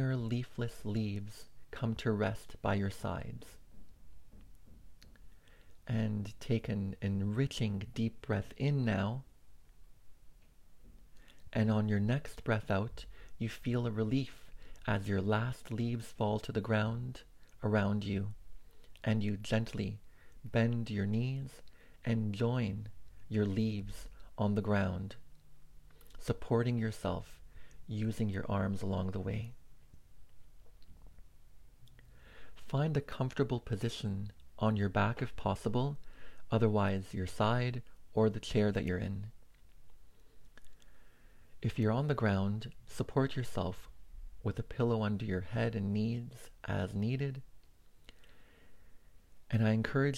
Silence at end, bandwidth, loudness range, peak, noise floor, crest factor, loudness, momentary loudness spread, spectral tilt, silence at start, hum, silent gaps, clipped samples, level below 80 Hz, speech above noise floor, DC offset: 0 s; 13.5 kHz; 6 LU; -16 dBFS; -58 dBFS; 20 dB; -36 LUFS; 13 LU; -7.5 dB/octave; 0 s; none; none; under 0.1%; -56 dBFS; 24 dB; under 0.1%